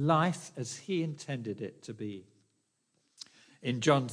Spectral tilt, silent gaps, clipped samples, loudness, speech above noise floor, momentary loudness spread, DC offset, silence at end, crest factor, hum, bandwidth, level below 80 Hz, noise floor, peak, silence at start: -5.5 dB/octave; none; under 0.1%; -34 LUFS; 45 dB; 23 LU; under 0.1%; 0 s; 22 dB; none; 10.5 kHz; -80 dBFS; -77 dBFS; -12 dBFS; 0 s